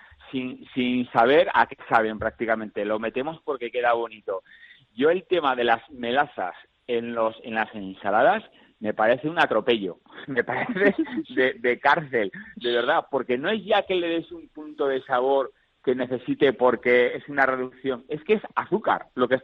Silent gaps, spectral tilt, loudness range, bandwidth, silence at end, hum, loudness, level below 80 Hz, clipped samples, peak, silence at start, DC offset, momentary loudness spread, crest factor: none; -7 dB/octave; 3 LU; 6.6 kHz; 0.05 s; none; -24 LUFS; -62 dBFS; under 0.1%; -4 dBFS; 0.25 s; under 0.1%; 11 LU; 20 dB